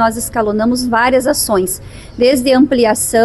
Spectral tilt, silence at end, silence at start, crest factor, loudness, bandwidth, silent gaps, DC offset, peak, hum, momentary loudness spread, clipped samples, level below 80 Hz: -3.5 dB/octave; 0 s; 0 s; 12 dB; -13 LUFS; 13 kHz; none; under 0.1%; -2 dBFS; none; 7 LU; under 0.1%; -38 dBFS